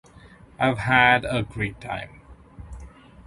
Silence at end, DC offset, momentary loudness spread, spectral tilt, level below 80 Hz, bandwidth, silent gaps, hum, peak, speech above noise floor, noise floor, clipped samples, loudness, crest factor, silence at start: 0.05 s; under 0.1%; 26 LU; -5.5 dB/octave; -46 dBFS; 11.5 kHz; none; none; -2 dBFS; 27 dB; -49 dBFS; under 0.1%; -22 LUFS; 22 dB; 0.6 s